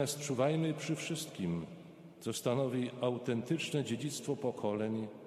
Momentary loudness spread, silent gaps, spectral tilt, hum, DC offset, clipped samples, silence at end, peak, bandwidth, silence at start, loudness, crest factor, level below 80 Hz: 8 LU; none; -5.5 dB/octave; none; under 0.1%; under 0.1%; 0 s; -18 dBFS; 14.5 kHz; 0 s; -36 LUFS; 18 dB; -74 dBFS